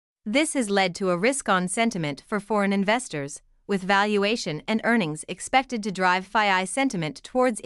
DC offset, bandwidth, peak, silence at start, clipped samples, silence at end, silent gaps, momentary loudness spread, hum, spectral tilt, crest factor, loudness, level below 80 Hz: under 0.1%; 12 kHz; -6 dBFS; 0.25 s; under 0.1%; 0.05 s; none; 9 LU; none; -4 dB/octave; 18 dB; -24 LUFS; -60 dBFS